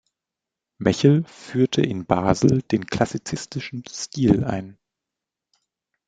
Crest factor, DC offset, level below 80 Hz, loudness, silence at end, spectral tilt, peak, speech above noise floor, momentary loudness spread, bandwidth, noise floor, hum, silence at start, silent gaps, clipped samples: 22 dB; under 0.1%; -50 dBFS; -22 LUFS; 1.35 s; -6.5 dB/octave; 0 dBFS; 65 dB; 13 LU; 9.2 kHz; -86 dBFS; none; 0.8 s; none; under 0.1%